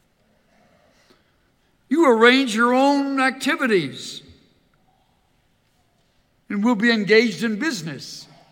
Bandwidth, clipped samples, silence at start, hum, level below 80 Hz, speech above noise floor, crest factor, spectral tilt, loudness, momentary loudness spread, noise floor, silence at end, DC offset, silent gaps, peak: 17 kHz; under 0.1%; 1.9 s; none; -70 dBFS; 45 dB; 20 dB; -4.5 dB/octave; -18 LUFS; 19 LU; -63 dBFS; 0.3 s; under 0.1%; none; -2 dBFS